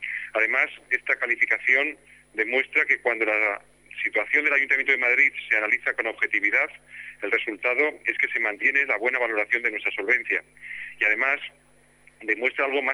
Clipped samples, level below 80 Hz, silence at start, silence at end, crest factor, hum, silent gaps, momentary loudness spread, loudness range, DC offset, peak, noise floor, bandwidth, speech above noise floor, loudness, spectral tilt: under 0.1%; -68 dBFS; 0 s; 0 s; 18 dB; 50 Hz at -65 dBFS; none; 9 LU; 3 LU; under 0.1%; -6 dBFS; -57 dBFS; 10.5 kHz; 32 dB; -22 LUFS; -2.5 dB/octave